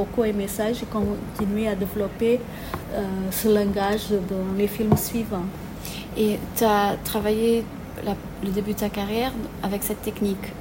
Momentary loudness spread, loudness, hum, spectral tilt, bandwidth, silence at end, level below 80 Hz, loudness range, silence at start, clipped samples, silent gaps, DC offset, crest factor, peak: 9 LU; -25 LUFS; none; -5.5 dB/octave; 16.5 kHz; 0 s; -42 dBFS; 2 LU; 0 s; under 0.1%; none; under 0.1%; 20 dB; -4 dBFS